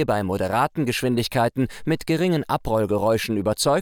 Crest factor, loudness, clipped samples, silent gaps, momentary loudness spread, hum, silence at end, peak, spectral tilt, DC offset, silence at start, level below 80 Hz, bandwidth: 14 dB; -22 LUFS; under 0.1%; none; 3 LU; none; 0 s; -8 dBFS; -5.5 dB/octave; under 0.1%; 0 s; -46 dBFS; over 20 kHz